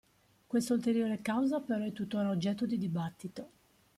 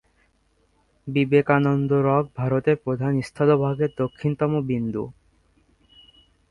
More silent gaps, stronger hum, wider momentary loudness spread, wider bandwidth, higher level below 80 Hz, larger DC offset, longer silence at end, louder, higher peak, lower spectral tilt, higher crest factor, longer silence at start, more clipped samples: neither; neither; first, 14 LU vs 7 LU; first, 14.5 kHz vs 11 kHz; second, -72 dBFS vs -56 dBFS; neither; second, 0.5 s vs 1.4 s; second, -33 LUFS vs -22 LUFS; second, -20 dBFS vs -4 dBFS; second, -6.5 dB/octave vs -9 dB/octave; about the same, 14 dB vs 18 dB; second, 0.5 s vs 1.05 s; neither